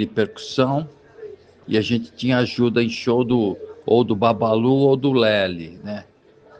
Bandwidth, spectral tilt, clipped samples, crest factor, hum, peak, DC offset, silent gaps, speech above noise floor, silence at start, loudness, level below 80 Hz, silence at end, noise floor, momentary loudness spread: 8.2 kHz; -7 dB/octave; under 0.1%; 16 dB; none; -4 dBFS; under 0.1%; none; 21 dB; 0 s; -19 LUFS; -58 dBFS; 0.6 s; -40 dBFS; 16 LU